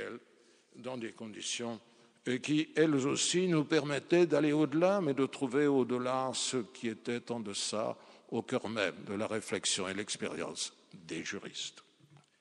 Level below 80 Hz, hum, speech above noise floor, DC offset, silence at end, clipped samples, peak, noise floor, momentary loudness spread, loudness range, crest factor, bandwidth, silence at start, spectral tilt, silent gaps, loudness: -82 dBFS; none; 32 dB; under 0.1%; 0.6 s; under 0.1%; -14 dBFS; -65 dBFS; 13 LU; 6 LU; 20 dB; 10.5 kHz; 0 s; -4 dB/octave; none; -33 LUFS